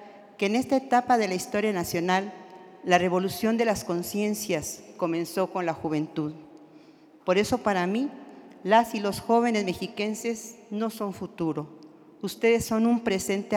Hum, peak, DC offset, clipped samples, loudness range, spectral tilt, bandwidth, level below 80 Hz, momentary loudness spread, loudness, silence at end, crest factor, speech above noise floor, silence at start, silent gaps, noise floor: none; -6 dBFS; under 0.1%; under 0.1%; 4 LU; -5 dB/octave; 18 kHz; -62 dBFS; 14 LU; -27 LUFS; 0 s; 22 dB; 27 dB; 0 s; none; -53 dBFS